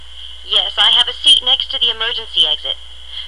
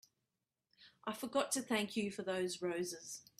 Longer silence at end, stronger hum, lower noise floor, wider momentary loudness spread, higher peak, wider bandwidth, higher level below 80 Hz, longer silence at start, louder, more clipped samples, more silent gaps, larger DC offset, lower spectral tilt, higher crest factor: second, 0 s vs 0.2 s; first, 60 Hz at -40 dBFS vs none; second, -34 dBFS vs -89 dBFS; first, 17 LU vs 9 LU; first, -2 dBFS vs -22 dBFS; second, 12 kHz vs 15.5 kHz; first, -42 dBFS vs -82 dBFS; second, 0 s vs 0.8 s; first, -12 LUFS vs -40 LUFS; neither; neither; first, 2% vs under 0.1%; second, 0.5 dB/octave vs -3 dB/octave; second, 14 dB vs 20 dB